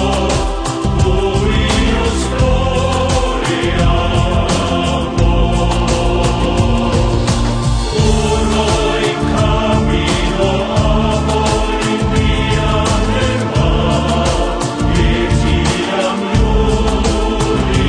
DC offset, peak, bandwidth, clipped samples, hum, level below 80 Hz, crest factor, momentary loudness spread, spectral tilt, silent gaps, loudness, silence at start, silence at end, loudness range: under 0.1%; 0 dBFS; 10 kHz; under 0.1%; none; -18 dBFS; 12 dB; 2 LU; -5.5 dB/octave; none; -14 LUFS; 0 s; 0 s; 0 LU